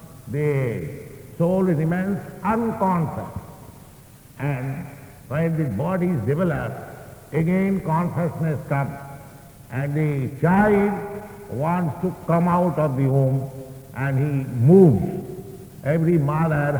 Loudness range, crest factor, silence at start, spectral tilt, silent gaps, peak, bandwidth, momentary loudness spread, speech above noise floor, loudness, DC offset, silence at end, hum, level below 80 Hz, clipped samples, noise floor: 7 LU; 20 dB; 0 s; -9 dB/octave; none; -2 dBFS; over 20 kHz; 18 LU; 25 dB; -22 LUFS; under 0.1%; 0 s; none; -50 dBFS; under 0.1%; -46 dBFS